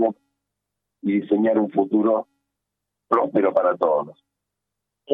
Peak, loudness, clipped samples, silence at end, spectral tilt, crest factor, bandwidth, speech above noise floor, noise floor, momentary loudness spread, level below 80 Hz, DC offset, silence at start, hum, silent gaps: -4 dBFS; -21 LUFS; under 0.1%; 0 s; -9.5 dB/octave; 18 dB; 3.9 kHz; 63 dB; -83 dBFS; 6 LU; -74 dBFS; under 0.1%; 0 s; 50 Hz at -55 dBFS; none